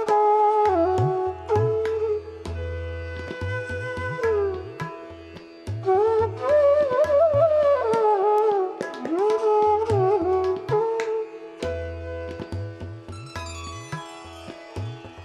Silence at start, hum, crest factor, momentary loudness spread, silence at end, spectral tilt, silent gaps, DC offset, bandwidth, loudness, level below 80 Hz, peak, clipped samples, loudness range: 0 s; none; 14 dB; 17 LU; 0 s; -7 dB/octave; none; under 0.1%; 11 kHz; -23 LUFS; -46 dBFS; -10 dBFS; under 0.1%; 12 LU